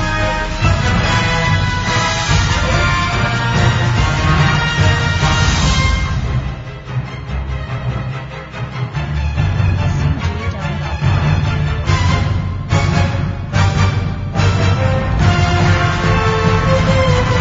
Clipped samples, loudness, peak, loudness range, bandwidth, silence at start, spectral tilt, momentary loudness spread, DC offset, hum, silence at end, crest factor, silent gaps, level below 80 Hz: under 0.1%; -15 LUFS; 0 dBFS; 6 LU; 7.8 kHz; 0 s; -5.5 dB/octave; 10 LU; under 0.1%; none; 0 s; 14 dB; none; -24 dBFS